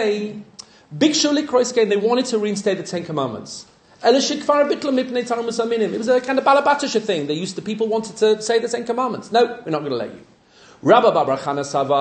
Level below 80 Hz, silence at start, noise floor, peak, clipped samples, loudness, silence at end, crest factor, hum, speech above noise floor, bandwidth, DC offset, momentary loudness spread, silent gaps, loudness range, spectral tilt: -66 dBFS; 0 s; -49 dBFS; -2 dBFS; under 0.1%; -19 LUFS; 0 s; 18 dB; none; 30 dB; 9.4 kHz; under 0.1%; 10 LU; none; 2 LU; -4 dB/octave